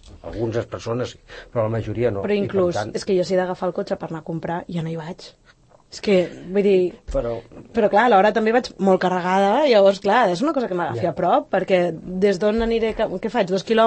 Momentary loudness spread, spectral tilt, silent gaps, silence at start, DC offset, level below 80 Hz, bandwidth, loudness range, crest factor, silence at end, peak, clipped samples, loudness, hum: 13 LU; -6.5 dB/octave; none; 0.05 s; under 0.1%; -44 dBFS; 8.8 kHz; 7 LU; 16 dB; 0 s; -4 dBFS; under 0.1%; -20 LUFS; none